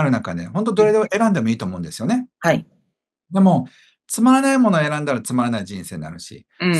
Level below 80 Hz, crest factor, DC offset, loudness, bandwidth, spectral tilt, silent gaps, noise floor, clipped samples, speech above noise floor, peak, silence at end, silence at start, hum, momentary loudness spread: -58 dBFS; 18 dB; under 0.1%; -19 LUFS; 12.5 kHz; -6 dB/octave; none; -71 dBFS; under 0.1%; 53 dB; -2 dBFS; 0 s; 0 s; none; 15 LU